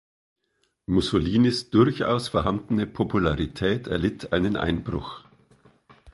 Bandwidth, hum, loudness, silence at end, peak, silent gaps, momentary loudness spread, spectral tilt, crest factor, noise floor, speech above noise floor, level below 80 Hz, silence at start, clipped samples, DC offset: 11.5 kHz; none; -24 LUFS; 0.05 s; -4 dBFS; none; 9 LU; -6.5 dB/octave; 20 dB; -72 dBFS; 49 dB; -42 dBFS; 0.9 s; under 0.1%; under 0.1%